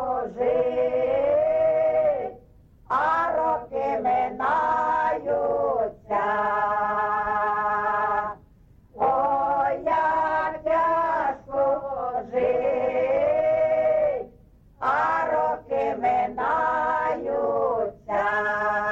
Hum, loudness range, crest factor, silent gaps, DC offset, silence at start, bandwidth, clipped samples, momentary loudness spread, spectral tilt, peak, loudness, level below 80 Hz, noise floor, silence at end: none; 1 LU; 12 dB; none; under 0.1%; 0 s; 7.4 kHz; under 0.1%; 5 LU; -6.5 dB/octave; -12 dBFS; -24 LUFS; -54 dBFS; -54 dBFS; 0 s